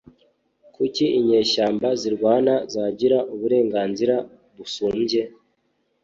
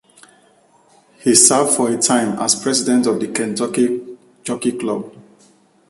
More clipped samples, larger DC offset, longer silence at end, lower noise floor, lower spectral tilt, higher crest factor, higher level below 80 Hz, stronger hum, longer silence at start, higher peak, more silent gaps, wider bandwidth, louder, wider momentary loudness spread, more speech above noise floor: neither; neither; about the same, 0.75 s vs 0.7 s; first, -69 dBFS vs -53 dBFS; first, -5 dB/octave vs -2.5 dB/octave; about the same, 16 dB vs 18 dB; about the same, -62 dBFS vs -62 dBFS; neither; second, 0.8 s vs 1.25 s; second, -6 dBFS vs 0 dBFS; neither; second, 7.8 kHz vs 13.5 kHz; second, -21 LUFS vs -16 LUFS; second, 9 LU vs 16 LU; first, 49 dB vs 37 dB